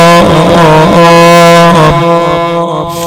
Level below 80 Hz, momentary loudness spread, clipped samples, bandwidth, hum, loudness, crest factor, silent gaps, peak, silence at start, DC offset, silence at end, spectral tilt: -28 dBFS; 8 LU; 4%; 18 kHz; none; -4 LUFS; 4 dB; none; 0 dBFS; 0 s; under 0.1%; 0 s; -5.5 dB/octave